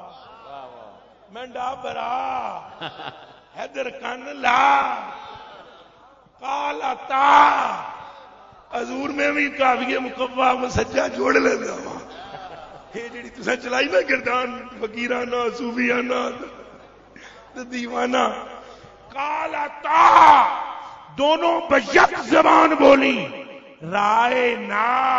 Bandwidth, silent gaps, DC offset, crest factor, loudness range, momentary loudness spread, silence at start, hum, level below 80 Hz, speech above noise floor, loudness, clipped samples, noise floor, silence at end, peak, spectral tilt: 7.8 kHz; none; under 0.1%; 22 dB; 11 LU; 23 LU; 0 s; none; -54 dBFS; 31 dB; -19 LUFS; under 0.1%; -51 dBFS; 0 s; 0 dBFS; -4 dB/octave